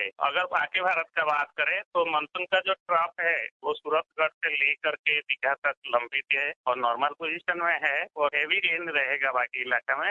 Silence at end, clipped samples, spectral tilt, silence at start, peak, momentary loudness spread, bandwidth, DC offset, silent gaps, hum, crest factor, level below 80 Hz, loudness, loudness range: 0 s; under 0.1%; -3.5 dB/octave; 0 s; -10 dBFS; 4 LU; 7.6 kHz; under 0.1%; 1.85-1.91 s, 2.80-2.86 s, 3.51-3.60 s, 4.34-4.41 s, 4.99-5.04 s, 5.58-5.62 s, 5.77-5.82 s, 6.56-6.64 s; none; 18 dB; -76 dBFS; -26 LUFS; 1 LU